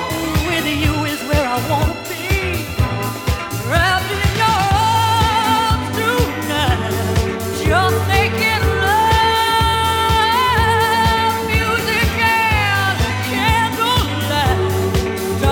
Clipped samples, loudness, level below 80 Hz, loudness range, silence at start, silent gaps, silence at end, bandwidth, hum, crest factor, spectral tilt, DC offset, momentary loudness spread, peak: under 0.1%; -16 LUFS; -28 dBFS; 4 LU; 0 s; none; 0 s; 19.5 kHz; none; 16 dB; -4.5 dB/octave; under 0.1%; 6 LU; -2 dBFS